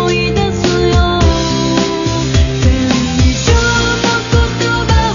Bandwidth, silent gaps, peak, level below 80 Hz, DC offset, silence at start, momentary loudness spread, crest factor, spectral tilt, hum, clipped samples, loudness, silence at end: 7.4 kHz; none; 0 dBFS; -18 dBFS; under 0.1%; 0 s; 3 LU; 12 dB; -5 dB/octave; none; under 0.1%; -12 LUFS; 0 s